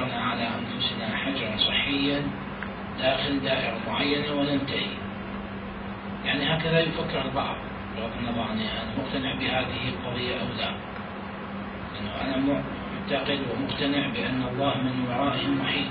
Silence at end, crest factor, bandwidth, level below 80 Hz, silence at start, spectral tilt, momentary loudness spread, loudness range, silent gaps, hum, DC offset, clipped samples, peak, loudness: 0 s; 18 dB; 5.2 kHz; -48 dBFS; 0 s; -10 dB/octave; 11 LU; 4 LU; none; none; under 0.1%; under 0.1%; -10 dBFS; -28 LUFS